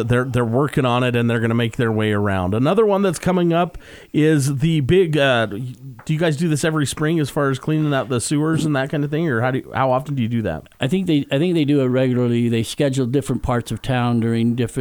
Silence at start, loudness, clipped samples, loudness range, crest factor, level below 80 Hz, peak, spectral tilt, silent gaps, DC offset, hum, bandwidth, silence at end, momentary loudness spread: 0 s; -19 LUFS; under 0.1%; 2 LU; 14 dB; -44 dBFS; -4 dBFS; -6.5 dB/octave; none; under 0.1%; none; 19 kHz; 0 s; 6 LU